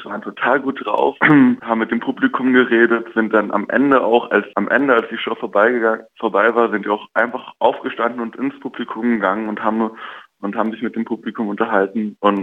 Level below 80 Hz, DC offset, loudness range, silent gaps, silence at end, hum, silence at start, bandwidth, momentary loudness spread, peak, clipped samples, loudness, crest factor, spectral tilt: -66 dBFS; under 0.1%; 6 LU; none; 0 s; none; 0 s; 4.1 kHz; 10 LU; 0 dBFS; under 0.1%; -17 LUFS; 16 dB; -8 dB/octave